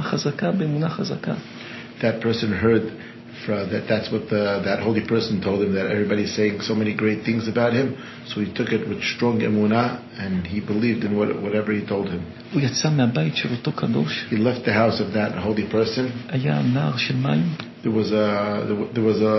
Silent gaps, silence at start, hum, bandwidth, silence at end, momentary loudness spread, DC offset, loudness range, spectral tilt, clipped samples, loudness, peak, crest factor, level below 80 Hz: none; 0 s; none; 6.2 kHz; 0 s; 7 LU; under 0.1%; 2 LU; -6.5 dB/octave; under 0.1%; -22 LUFS; -6 dBFS; 16 dB; -50 dBFS